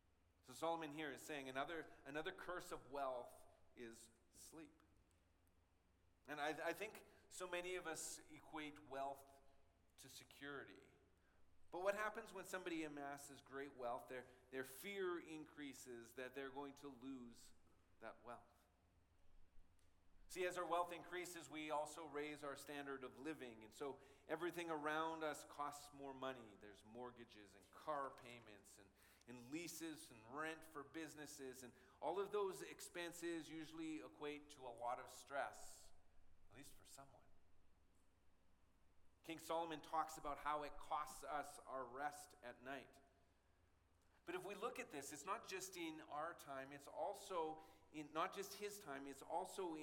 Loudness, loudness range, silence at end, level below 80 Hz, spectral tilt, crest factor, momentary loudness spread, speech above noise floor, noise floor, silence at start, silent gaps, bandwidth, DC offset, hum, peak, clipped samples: -51 LUFS; 7 LU; 0 s; -76 dBFS; -3.5 dB/octave; 24 dB; 15 LU; 27 dB; -78 dBFS; 0.45 s; none; 17.5 kHz; under 0.1%; none; -28 dBFS; under 0.1%